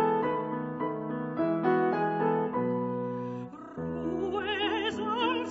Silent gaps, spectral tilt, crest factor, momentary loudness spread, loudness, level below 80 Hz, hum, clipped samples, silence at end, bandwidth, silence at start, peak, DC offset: none; -7 dB/octave; 16 dB; 9 LU; -30 LUFS; -62 dBFS; none; under 0.1%; 0 s; 8 kHz; 0 s; -14 dBFS; under 0.1%